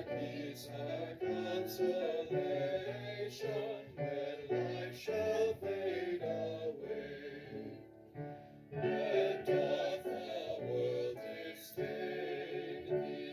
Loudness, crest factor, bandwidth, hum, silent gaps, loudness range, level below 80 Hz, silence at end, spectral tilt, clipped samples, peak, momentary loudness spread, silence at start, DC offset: -39 LUFS; 18 dB; 16 kHz; none; none; 3 LU; -72 dBFS; 0 s; -6 dB/octave; under 0.1%; -22 dBFS; 13 LU; 0 s; under 0.1%